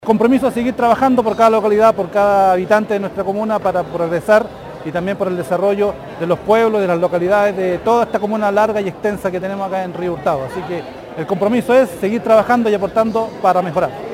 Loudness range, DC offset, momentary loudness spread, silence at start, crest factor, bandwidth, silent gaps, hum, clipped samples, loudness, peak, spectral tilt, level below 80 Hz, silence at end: 4 LU; under 0.1%; 9 LU; 0 s; 16 dB; 17 kHz; none; none; under 0.1%; -16 LUFS; 0 dBFS; -6.5 dB/octave; -48 dBFS; 0 s